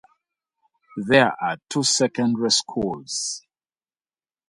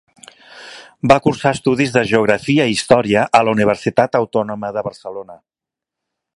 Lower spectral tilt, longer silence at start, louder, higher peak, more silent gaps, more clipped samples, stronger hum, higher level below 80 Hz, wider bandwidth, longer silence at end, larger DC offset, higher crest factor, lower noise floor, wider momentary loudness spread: second, -3 dB/octave vs -5.5 dB/octave; first, 0.95 s vs 0.55 s; second, -21 LUFS vs -15 LUFS; about the same, 0 dBFS vs 0 dBFS; neither; neither; neither; second, -60 dBFS vs -50 dBFS; about the same, 11.5 kHz vs 11.5 kHz; about the same, 1.1 s vs 1 s; neither; first, 24 dB vs 16 dB; first, under -90 dBFS vs -85 dBFS; second, 13 LU vs 17 LU